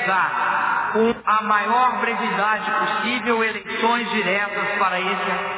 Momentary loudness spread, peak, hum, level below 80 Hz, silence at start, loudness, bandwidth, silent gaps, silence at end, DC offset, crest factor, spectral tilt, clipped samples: 3 LU; -6 dBFS; none; -60 dBFS; 0 s; -20 LUFS; 4 kHz; none; 0 s; under 0.1%; 16 dB; -7.5 dB/octave; under 0.1%